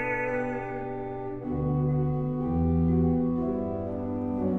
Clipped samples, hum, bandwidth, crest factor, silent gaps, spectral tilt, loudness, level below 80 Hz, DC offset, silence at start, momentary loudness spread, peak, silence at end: under 0.1%; none; 3.7 kHz; 12 dB; none; -11 dB/octave; -28 LUFS; -42 dBFS; under 0.1%; 0 s; 10 LU; -16 dBFS; 0 s